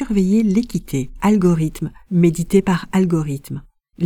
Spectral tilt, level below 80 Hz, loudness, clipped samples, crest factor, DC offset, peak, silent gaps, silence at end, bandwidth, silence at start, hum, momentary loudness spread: -7.5 dB/octave; -40 dBFS; -18 LUFS; under 0.1%; 16 dB; under 0.1%; -2 dBFS; none; 0 s; 16 kHz; 0 s; none; 12 LU